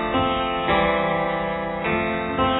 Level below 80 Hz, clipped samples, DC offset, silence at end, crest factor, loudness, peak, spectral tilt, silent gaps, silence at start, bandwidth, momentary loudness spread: -40 dBFS; under 0.1%; under 0.1%; 0 s; 18 dB; -22 LUFS; -6 dBFS; -9 dB/octave; none; 0 s; 4.1 kHz; 5 LU